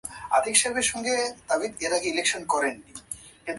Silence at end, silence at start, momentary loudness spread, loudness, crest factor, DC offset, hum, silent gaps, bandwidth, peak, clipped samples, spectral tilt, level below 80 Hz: 0 s; 0.05 s; 17 LU; -25 LUFS; 22 dB; under 0.1%; none; none; 12 kHz; -4 dBFS; under 0.1%; -0.5 dB/octave; -60 dBFS